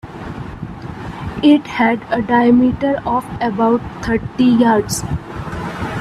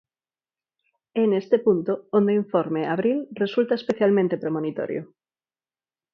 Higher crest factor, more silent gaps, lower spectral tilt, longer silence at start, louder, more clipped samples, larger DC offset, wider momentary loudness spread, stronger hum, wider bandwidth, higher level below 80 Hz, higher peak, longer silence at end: about the same, 16 dB vs 18 dB; neither; second, -6 dB/octave vs -8.5 dB/octave; second, 0.05 s vs 1.15 s; first, -16 LUFS vs -23 LUFS; neither; neither; first, 17 LU vs 7 LU; neither; first, 14 kHz vs 7 kHz; first, -38 dBFS vs -70 dBFS; first, 0 dBFS vs -6 dBFS; second, 0 s vs 1.1 s